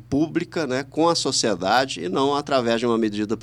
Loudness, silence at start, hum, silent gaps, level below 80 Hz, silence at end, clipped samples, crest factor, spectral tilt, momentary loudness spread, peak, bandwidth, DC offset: -22 LUFS; 0 s; none; none; -54 dBFS; 0 s; under 0.1%; 16 dB; -4 dB/octave; 5 LU; -6 dBFS; 14 kHz; under 0.1%